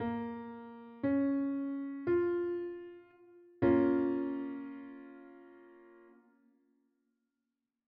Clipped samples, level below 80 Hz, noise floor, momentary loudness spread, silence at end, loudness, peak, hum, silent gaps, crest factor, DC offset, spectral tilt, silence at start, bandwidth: under 0.1%; -72 dBFS; -88 dBFS; 21 LU; 1.95 s; -34 LUFS; -16 dBFS; none; none; 20 dB; under 0.1%; -7.5 dB/octave; 0 s; 4.5 kHz